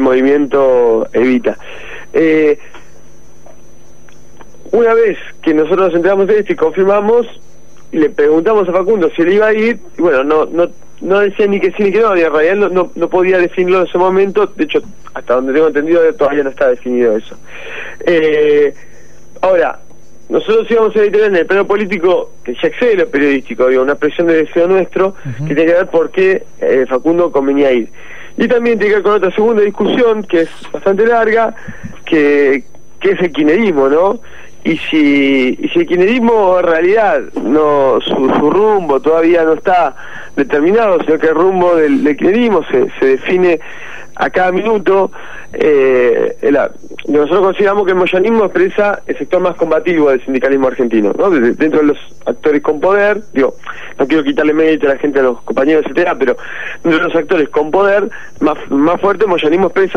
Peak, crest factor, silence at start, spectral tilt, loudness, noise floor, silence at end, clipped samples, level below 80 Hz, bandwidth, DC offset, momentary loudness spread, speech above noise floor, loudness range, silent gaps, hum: -2 dBFS; 8 dB; 0 s; -6.5 dB/octave; -12 LUFS; -43 dBFS; 0 s; under 0.1%; -46 dBFS; 7.2 kHz; 5%; 8 LU; 31 dB; 2 LU; none; none